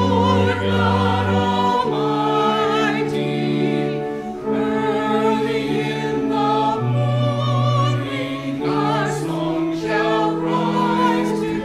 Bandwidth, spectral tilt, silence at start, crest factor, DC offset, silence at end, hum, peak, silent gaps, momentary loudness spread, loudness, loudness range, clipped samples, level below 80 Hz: 13.5 kHz; -6.5 dB/octave; 0 s; 14 dB; under 0.1%; 0 s; none; -4 dBFS; none; 5 LU; -19 LUFS; 2 LU; under 0.1%; -52 dBFS